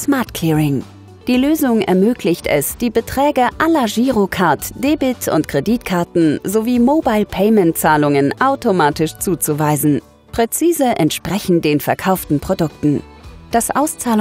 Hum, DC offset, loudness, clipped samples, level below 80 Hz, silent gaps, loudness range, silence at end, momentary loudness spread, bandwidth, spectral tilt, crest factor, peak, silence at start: none; under 0.1%; -16 LUFS; under 0.1%; -42 dBFS; none; 2 LU; 0 s; 5 LU; 16.5 kHz; -5.5 dB/octave; 14 dB; 0 dBFS; 0 s